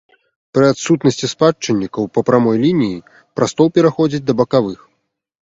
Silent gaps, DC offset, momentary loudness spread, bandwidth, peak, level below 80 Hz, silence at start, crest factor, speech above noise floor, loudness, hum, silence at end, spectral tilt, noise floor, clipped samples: none; under 0.1%; 8 LU; 8 kHz; 0 dBFS; -54 dBFS; 0.55 s; 16 dB; 55 dB; -15 LUFS; none; 0.7 s; -6 dB/octave; -69 dBFS; under 0.1%